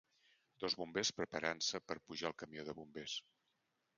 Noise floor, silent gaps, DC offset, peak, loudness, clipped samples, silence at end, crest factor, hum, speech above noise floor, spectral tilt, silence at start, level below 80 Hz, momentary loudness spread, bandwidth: -84 dBFS; none; under 0.1%; -20 dBFS; -42 LUFS; under 0.1%; 0.75 s; 26 dB; none; 41 dB; -2 dB/octave; 0.6 s; -76 dBFS; 11 LU; 9.6 kHz